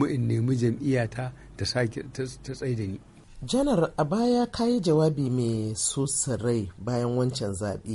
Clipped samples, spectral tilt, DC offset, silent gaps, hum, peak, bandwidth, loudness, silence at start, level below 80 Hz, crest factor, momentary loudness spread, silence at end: under 0.1%; -5.5 dB/octave; under 0.1%; none; none; -10 dBFS; 11.5 kHz; -27 LUFS; 0 s; -50 dBFS; 16 dB; 11 LU; 0 s